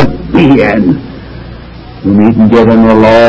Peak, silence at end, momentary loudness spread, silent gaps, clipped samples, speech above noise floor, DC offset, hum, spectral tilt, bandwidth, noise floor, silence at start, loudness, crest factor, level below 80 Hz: 0 dBFS; 0 s; 22 LU; none; 6%; 22 dB; under 0.1%; none; -8.5 dB/octave; 8 kHz; -26 dBFS; 0 s; -7 LUFS; 6 dB; -28 dBFS